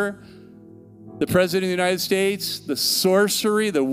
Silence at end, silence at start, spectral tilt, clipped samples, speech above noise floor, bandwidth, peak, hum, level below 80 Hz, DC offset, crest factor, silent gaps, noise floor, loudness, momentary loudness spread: 0 s; 0 s; -3.5 dB/octave; under 0.1%; 24 dB; 16 kHz; -6 dBFS; none; -56 dBFS; under 0.1%; 16 dB; none; -45 dBFS; -21 LUFS; 9 LU